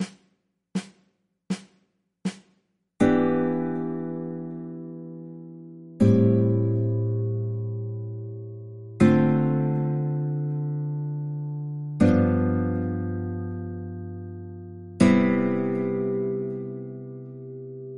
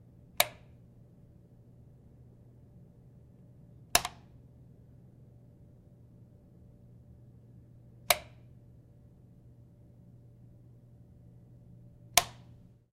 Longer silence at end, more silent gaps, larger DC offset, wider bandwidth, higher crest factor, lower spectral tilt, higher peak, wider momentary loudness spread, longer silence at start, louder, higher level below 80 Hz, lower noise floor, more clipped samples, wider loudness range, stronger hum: second, 0 s vs 0.5 s; neither; neither; second, 11 kHz vs 15.5 kHz; second, 20 dB vs 38 dB; first, -8.5 dB/octave vs -1 dB/octave; about the same, -4 dBFS vs -2 dBFS; second, 19 LU vs 29 LU; second, 0 s vs 0.4 s; first, -25 LUFS vs -30 LUFS; about the same, -58 dBFS vs -60 dBFS; first, -71 dBFS vs -57 dBFS; neither; second, 3 LU vs 21 LU; neither